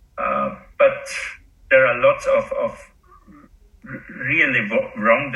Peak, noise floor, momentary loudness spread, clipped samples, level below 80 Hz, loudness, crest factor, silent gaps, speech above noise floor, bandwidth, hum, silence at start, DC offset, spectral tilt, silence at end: -2 dBFS; -49 dBFS; 13 LU; under 0.1%; -52 dBFS; -19 LUFS; 20 dB; none; 29 dB; 11.5 kHz; none; 0.15 s; under 0.1%; -5 dB/octave; 0 s